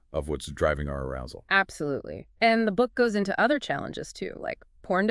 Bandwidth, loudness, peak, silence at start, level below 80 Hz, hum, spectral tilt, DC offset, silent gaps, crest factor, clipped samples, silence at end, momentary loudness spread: 12 kHz; -27 LUFS; -8 dBFS; 0.1 s; -46 dBFS; none; -5.5 dB/octave; under 0.1%; none; 20 dB; under 0.1%; 0 s; 13 LU